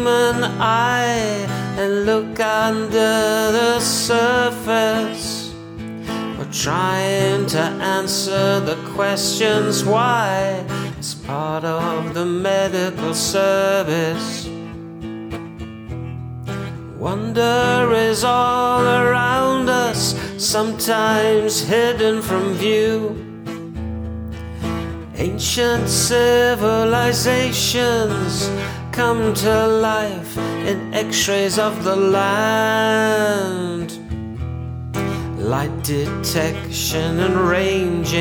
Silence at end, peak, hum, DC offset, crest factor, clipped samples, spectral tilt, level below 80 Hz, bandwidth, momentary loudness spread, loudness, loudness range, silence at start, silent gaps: 0 s; -4 dBFS; none; under 0.1%; 14 dB; under 0.1%; -4 dB/octave; -42 dBFS; over 20 kHz; 12 LU; -18 LUFS; 6 LU; 0 s; none